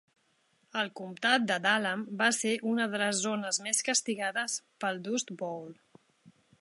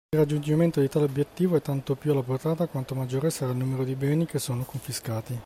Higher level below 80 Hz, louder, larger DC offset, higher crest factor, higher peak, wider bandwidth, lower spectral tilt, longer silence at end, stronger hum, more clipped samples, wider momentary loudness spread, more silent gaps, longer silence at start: second, -84 dBFS vs -58 dBFS; second, -30 LUFS vs -27 LUFS; neither; first, 22 dB vs 16 dB; about the same, -10 dBFS vs -12 dBFS; second, 11.5 kHz vs 16 kHz; second, -2 dB/octave vs -7 dB/octave; first, 0.3 s vs 0 s; neither; neither; about the same, 10 LU vs 8 LU; neither; first, 0.75 s vs 0.1 s